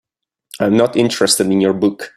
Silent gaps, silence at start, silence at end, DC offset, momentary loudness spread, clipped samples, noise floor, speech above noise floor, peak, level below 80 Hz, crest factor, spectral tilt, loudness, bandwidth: none; 0.55 s; 0.1 s; under 0.1%; 4 LU; under 0.1%; -56 dBFS; 42 dB; 0 dBFS; -56 dBFS; 14 dB; -4 dB/octave; -14 LUFS; 14.5 kHz